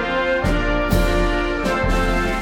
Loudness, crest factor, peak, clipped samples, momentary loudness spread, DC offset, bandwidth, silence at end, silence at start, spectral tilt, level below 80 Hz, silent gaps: -20 LUFS; 12 dB; -6 dBFS; under 0.1%; 2 LU; under 0.1%; 17 kHz; 0 s; 0 s; -5.5 dB/octave; -24 dBFS; none